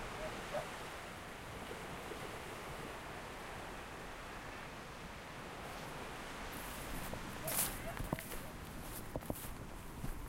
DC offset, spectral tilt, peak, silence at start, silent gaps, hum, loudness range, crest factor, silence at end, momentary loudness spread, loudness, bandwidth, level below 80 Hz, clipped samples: under 0.1%; -3.5 dB/octave; -20 dBFS; 0 s; none; none; 5 LU; 26 dB; 0 s; 6 LU; -45 LUFS; 16 kHz; -54 dBFS; under 0.1%